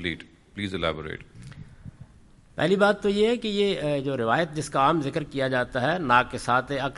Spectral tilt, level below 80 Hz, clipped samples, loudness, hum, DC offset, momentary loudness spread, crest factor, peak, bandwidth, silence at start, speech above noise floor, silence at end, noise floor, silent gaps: -5.5 dB/octave; -52 dBFS; under 0.1%; -25 LUFS; none; under 0.1%; 18 LU; 20 dB; -6 dBFS; 11.5 kHz; 0 s; 28 dB; 0 s; -53 dBFS; none